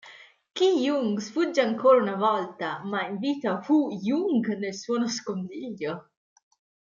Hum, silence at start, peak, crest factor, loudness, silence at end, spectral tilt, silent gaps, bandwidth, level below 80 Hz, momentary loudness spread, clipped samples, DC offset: none; 0.05 s; -8 dBFS; 18 dB; -26 LUFS; 0.95 s; -5 dB/octave; none; 7.4 kHz; -76 dBFS; 13 LU; under 0.1%; under 0.1%